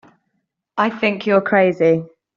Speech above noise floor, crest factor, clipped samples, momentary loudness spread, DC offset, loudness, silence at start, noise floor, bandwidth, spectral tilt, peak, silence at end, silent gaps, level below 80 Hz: 56 dB; 16 dB; under 0.1%; 7 LU; under 0.1%; -17 LUFS; 0.75 s; -72 dBFS; 7.2 kHz; -4.5 dB/octave; -2 dBFS; 0.3 s; none; -64 dBFS